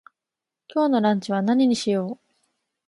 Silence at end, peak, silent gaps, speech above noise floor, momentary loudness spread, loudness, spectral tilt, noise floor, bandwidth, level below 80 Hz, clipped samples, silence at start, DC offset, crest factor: 0.75 s; -6 dBFS; none; 66 dB; 11 LU; -22 LUFS; -6 dB/octave; -87 dBFS; 11.5 kHz; -72 dBFS; under 0.1%; 0.75 s; under 0.1%; 16 dB